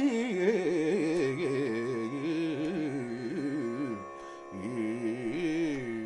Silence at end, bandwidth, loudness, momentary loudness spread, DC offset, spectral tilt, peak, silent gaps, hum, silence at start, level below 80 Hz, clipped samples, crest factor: 0 s; 11 kHz; -32 LUFS; 9 LU; under 0.1%; -6.5 dB/octave; -14 dBFS; none; none; 0 s; -68 dBFS; under 0.1%; 16 dB